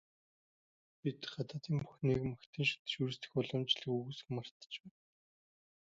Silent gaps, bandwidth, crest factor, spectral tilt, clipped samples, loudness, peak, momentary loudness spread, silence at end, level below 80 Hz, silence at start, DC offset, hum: 2.46-2.53 s, 2.79-2.85 s, 4.51-4.60 s; 7.6 kHz; 22 dB; -4.5 dB/octave; under 0.1%; -39 LUFS; -20 dBFS; 9 LU; 0.95 s; -68 dBFS; 1.05 s; under 0.1%; none